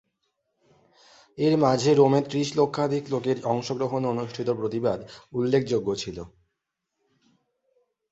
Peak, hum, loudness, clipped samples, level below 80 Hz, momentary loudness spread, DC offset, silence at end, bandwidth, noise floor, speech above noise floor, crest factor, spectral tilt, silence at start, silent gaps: -6 dBFS; none; -25 LUFS; under 0.1%; -60 dBFS; 12 LU; under 0.1%; 1.85 s; 8.2 kHz; -82 dBFS; 58 dB; 20 dB; -6.5 dB/octave; 1.35 s; none